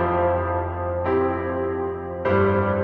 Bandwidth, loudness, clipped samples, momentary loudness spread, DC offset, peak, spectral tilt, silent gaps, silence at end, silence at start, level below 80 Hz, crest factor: 4.7 kHz; -23 LUFS; under 0.1%; 7 LU; under 0.1%; -8 dBFS; -10.5 dB/octave; none; 0 s; 0 s; -42 dBFS; 14 dB